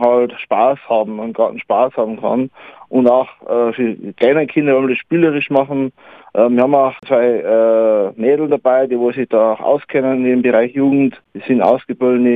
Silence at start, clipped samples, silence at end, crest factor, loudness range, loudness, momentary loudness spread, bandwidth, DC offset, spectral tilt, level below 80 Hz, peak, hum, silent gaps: 0 s; under 0.1%; 0 s; 14 dB; 2 LU; -15 LUFS; 7 LU; 4.5 kHz; under 0.1%; -9 dB/octave; -62 dBFS; 0 dBFS; none; none